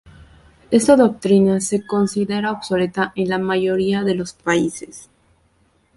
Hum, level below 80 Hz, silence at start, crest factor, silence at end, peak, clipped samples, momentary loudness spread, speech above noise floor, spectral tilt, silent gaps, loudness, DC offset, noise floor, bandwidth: none; -54 dBFS; 0.7 s; 16 dB; 0.95 s; -2 dBFS; under 0.1%; 8 LU; 42 dB; -5.5 dB/octave; none; -18 LUFS; under 0.1%; -60 dBFS; 11.5 kHz